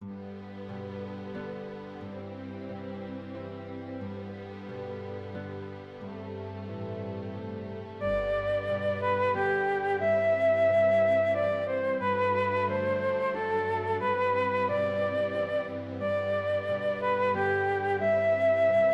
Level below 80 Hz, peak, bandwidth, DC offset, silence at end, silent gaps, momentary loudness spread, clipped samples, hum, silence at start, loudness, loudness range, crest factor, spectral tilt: -58 dBFS; -16 dBFS; 8 kHz; under 0.1%; 0 s; none; 16 LU; under 0.1%; none; 0 s; -29 LUFS; 14 LU; 12 dB; -7.5 dB/octave